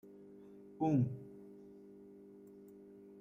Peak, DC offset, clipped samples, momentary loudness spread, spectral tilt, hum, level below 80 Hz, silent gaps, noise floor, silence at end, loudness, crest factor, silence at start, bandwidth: -22 dBFS; under 0.1%; under 0.1%; 23 LU; -10.5 dB/octave; 50 Hz at -60 dBFS; -76 dBFS; none; -57 dBFS; 0 s; -36 LUFS; 20 dB; 0.05 s; 6.8 kHz